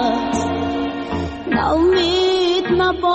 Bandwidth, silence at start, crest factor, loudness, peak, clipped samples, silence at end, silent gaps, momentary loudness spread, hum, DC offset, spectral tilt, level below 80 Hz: 8.4 kHz; 0 s; 10 dB; -18 LUFS; -6 dBFS; under 0.1%; 0 s; none; 8 LU; none; under 0.1%; -5 dB/octave; -38 dBFS